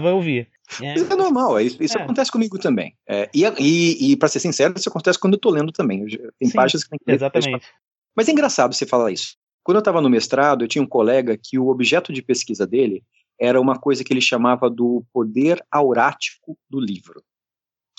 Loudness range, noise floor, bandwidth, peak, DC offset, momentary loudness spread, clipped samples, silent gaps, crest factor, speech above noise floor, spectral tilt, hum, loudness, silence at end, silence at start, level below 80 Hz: 2 LU; under -90 dBFS; 8.4 kHz; -2 dBFS; under 0.1%; 10 LU; under 0.1%; 7.87-7.91 s, 7.98-8.02 s, 9.37-9.47 s, 9.53-9.59 s; 16 dB; over 72 dB; -4.5 dB/octave; none; -19 LUFS; 1 s; 0 s; -72 dBFS